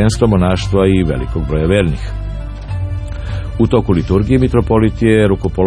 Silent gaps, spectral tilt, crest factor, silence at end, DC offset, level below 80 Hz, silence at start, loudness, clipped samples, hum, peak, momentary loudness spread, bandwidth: none; -7.5 dB/octave; 14 dB; 0 s; under 0.1%; -24 dBFS; 0 s; -14 LUFS; under 0.1%; none; 0 dBFS; 11 LU; 10.5 kHz